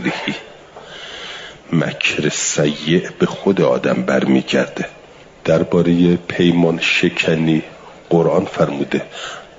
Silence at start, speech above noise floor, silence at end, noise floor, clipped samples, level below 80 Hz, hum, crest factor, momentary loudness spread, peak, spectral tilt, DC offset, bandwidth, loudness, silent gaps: 0 s; 22 dB; 0.1 s; -38 dBFS; under 0.1%; -52 dBFS; none; 14 dB; 15 LU; -2 dBFS; -5 dB/octave; under 0.1%; 7.8 kHz; -16 LUFS; none